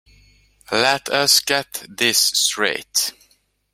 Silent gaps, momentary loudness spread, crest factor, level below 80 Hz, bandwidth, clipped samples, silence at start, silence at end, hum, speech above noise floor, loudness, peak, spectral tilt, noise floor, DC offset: none; 8 LU; 20 dB; -60 dBFS; 16 kHz; under 0.1%; 0.7 s; 0.6 s; none; 42 dB; -17 LUFS; 0 dBFS; -0.5 dB/octave; -61 dBFS; under 0.1%